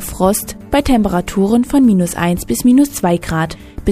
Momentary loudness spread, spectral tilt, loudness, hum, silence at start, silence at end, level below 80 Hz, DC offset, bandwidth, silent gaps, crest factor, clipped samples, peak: 8 LU; -5.5 dB/octave; -14 LUFS; none; 0 s; 0 s; -32 dBFS; under 0.1%; 15.5 kHz; none; 14 dB; under 0.1%; 0 dBFS